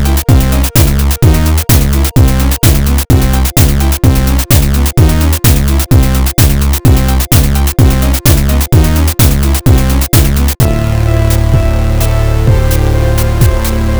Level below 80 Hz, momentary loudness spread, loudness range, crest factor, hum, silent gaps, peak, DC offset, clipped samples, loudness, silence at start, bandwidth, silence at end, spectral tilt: -10 dBFS; 2 LU; 1 LU; 8 dB; none; none; 0 dBFS; 4%; under 0.1%; -9 LUFS; 0 s; over 20 kHz; 0 s; -5.5 dB/octave